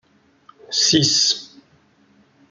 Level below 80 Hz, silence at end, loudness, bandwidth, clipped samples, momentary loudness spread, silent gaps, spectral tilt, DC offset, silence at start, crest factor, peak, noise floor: -60 dBFS; 1.05 s; -16 LUFS; 12 kHz; under 0.1%; 10 LU; none; -2 dB/octave; under 0.1%; 0.7 s; 20 dB; -4 dBFS; -57 dBFS